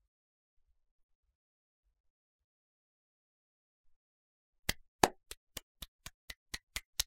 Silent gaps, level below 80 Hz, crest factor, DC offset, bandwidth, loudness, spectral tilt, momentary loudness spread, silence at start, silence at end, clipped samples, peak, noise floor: 4.88-4.99 s, 5.37-5.47 s, 5.63-5.75 s, 5.88-5.99 s, 6.14-6.28 s, 6.37-6.46 s, 6.63-6.67 s, 6.85-6.93 s; -60 dBFS; 40 dB; under 0.1%; 16 kHz; -38 LUFS; -2 dB/octave; 20 LU; 4.7 s; 0.05 s; under 0.1%; -6 dBFS; under -90 dBFS